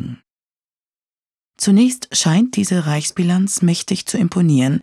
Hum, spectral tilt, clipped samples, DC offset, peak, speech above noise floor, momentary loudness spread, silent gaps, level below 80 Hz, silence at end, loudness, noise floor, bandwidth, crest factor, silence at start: none; -5 dB/octave; under 0.1%; under 0.1%; -4 dBFS; over 74 dB; 6 LU; 0.32-0.36 s, 0.43-0.47 s, 0.56-1.06 s, 1.19-1.31 s, 1.45-1.49 s; -60 dBFS; 0 s; -16 LUFS; under -90 dBFS; 13.5 kHz; 14 dB; 0 s